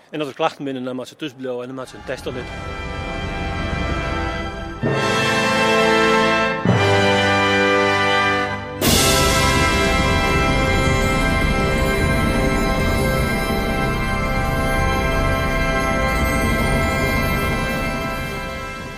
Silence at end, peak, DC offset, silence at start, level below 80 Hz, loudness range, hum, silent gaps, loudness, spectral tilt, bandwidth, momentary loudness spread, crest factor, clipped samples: 0 s; -4 dBFS; under 0.1%; 0.1 s; -28 dBFS; 10 LU; none; none; -18 LUFS; -4.5 dB/octave; 16 kHz; 13 LU; 16 dB; under 0.1%